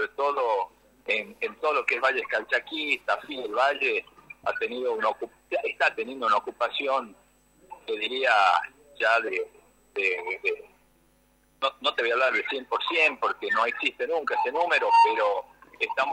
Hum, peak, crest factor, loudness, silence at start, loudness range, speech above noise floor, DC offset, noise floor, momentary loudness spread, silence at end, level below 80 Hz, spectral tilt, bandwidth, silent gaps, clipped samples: none; -8 dBFS; 18 dB; -26 LUFS; 0 s; 4 LU; 38 dB; under 0.1%; -64 dBFS; 10 LU; 0 s; -70 dBFS; -2 dB/octave; 16 kHz; none; under 0.1%